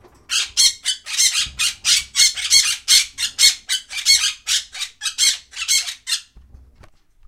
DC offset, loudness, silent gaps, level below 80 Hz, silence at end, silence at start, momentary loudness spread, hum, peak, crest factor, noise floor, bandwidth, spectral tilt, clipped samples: under 0.1%; -16 LUFS; none; -50 dBFS; 1.05 s; 0.3 s; 10 LU; none; 0 dBFS; 20 dB; -49 dBFS; 16.5 kHz; 4 dB/octave; under 0.1%